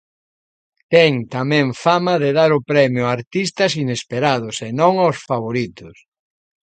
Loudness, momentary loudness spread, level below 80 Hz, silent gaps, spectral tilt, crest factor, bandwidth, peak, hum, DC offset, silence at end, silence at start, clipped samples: -17 LUFS; 8 LU; -60 dBFS; 3.27-3.31 s; -5.5 dB/octave; 18 dB; 9.2 kHz; 0 dBFS; none; under 0.1%; 0.8 s; 0.9 s; under 0.1%